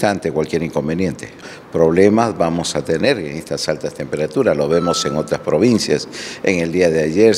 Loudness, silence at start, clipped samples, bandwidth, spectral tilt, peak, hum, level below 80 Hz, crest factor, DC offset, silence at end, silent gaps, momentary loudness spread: -17 LUFS; 0 s; under 0.1%; 14.5 kHz; -5 dB/octave; 0 dBFS; none; -50 dBFS; 16 dB; under 0.1%; 0 s; none; 10 LU